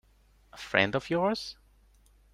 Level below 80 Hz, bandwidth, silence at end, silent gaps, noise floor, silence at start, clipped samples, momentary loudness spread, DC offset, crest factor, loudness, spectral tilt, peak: -60 dBFS; 15 kHz; 0.8 s; none; -63 dBFS; 0.55 s; under 0.1%; 15 LU; under 0.1%; 26 dB; -28 LUFS; -5 dB/octave; -6 dBFS